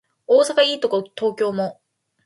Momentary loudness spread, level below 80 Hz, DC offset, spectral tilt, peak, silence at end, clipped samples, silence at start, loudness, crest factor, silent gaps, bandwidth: 10 LU; -72 dBFS; under 0.1%; -3.5 dB/octave; -4 dBFS; 0.55 s; under 0.1%; 0.3 s; -20 LUFS; 16 dB; none; 11.5 kHz